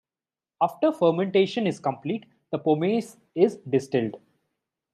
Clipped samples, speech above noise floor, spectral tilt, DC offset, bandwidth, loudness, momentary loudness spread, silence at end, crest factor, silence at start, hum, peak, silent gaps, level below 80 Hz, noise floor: under 0.1%; over 66 dB; -7 dB/octave; under 0.1%; 13 kHz; -25 LUFS; 10 LU; 0.75 s; 20 dB; 0.6 s; none; -6 dBFS; none; -76 dBFS; under -90 dBFS